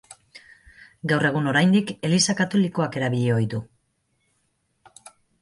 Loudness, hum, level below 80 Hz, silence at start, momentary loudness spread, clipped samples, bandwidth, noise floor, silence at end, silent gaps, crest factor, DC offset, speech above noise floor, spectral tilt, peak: -22 LUFS; none; -62 dBFS; 0.1 s; 7 LU; under 0.1%; 11.5 kHz; -71 dBFS; 1.75 s; none; 18 dB; under 0.1%; 50 dB; -5 dB/octave; -6 dBFS